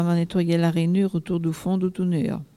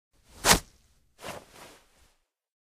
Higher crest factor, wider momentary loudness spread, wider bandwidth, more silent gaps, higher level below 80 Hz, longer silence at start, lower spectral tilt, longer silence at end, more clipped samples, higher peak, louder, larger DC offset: second, 12 dB vs 28 dB; second, 4 LU vs 22 LU; second, 12.5 kHz vs 15.5 kHz; neither; second, -56 dBFS vs -46 dBFS; second, 0 s vs 0.45 s; first, -8 dB/octave vs -1.5 dB/octave; second, 0.15 s vs 1.35 s; neither; second, -10 dBFS vs -4 dBFS; about the same, -23 LUFS vs -23 LUFS; neither